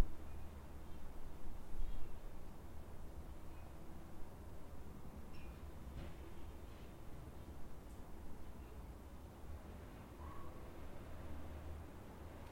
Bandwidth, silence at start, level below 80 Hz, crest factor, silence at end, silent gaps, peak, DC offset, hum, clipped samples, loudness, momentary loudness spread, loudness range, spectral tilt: 16.5 kHz; 0 s; -52 dBFS; 24 dB; 0 s; none; -20 dBFS; under 0.1%; none; under 0.1%; -55 LUFS; 4 LU; 2 LU; -6.5 dB/octave